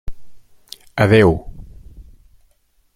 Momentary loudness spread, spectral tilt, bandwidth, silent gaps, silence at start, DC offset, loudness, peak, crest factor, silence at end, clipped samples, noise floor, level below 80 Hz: 27 LU; -7.5 dB/octave; 14.5 kHz; none; 0.05 s; under 0.1%; -15 LUFS; -2 dBFS; 18 dB; 0.95 s; under 0.1%; -59 dBFS; -38 dBFS